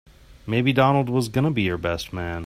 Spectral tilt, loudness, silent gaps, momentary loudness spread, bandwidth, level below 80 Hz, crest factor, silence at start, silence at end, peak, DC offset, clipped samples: -6.5 dB/octave; -22 LUFS; none; 10 LU; 15 kHz; -48 dBFS; 18 dB; 0.3 s; 0 s; -4 dBFS; under 0.1%; under 0.1%